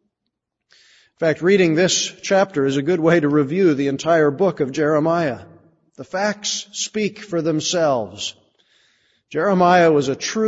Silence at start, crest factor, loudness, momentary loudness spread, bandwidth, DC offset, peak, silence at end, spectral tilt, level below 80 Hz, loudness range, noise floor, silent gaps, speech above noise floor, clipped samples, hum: 1.2 s; 16 dB; -18 LUFS; 9 LU; 8 kHz; under 0.1%; -2 dBFS; 0 s; -4.5 dB/octave; -62 dBFS; 5 LU; -79 dBFS; none; 61 dB; under 0.1%; none